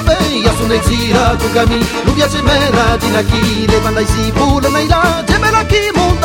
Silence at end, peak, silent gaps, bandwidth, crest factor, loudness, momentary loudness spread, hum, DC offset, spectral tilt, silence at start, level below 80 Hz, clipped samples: 0 s; 0 dBFS; none; 18 kHz; 12 dB; -12 LUFS; 2 LU; none; under 0.1%; -5 dB/octave; 0 s; -20 dBFS; under 0.1%